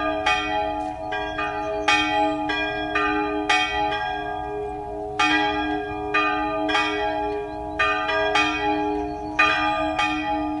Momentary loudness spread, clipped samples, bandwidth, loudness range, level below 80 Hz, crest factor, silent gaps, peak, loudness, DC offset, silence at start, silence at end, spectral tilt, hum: 9 LU; under 0.1%; 11.5 kHz; 1 LU; -44 dBFS; 18 dB; none; -4 dBFS; -23 LUFS; under 0.1%; 0 s; 0 s; -3.5 dB/octave; none